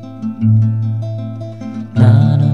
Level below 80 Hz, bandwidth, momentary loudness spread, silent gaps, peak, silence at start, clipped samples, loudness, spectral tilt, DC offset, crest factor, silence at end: -48 dBFS; 4.5 kHz; 16 LU; none; -2 dBFS; 0 s; under 0.1%; -14 LUFS; -10 dB/octave; 0.7%; 12 dB; 0 s